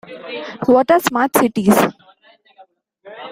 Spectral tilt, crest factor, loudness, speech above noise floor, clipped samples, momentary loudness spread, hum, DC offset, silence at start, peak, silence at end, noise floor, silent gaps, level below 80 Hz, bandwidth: -5 dB/octave; 18 dB; -15 LUFS; 36 dB; under 0.1%; 16 LU; none; under 0.1%; 0.1 s; 0 dBFS; 0 s; -51 dBFS; none; -56 dBFS; 16 kHz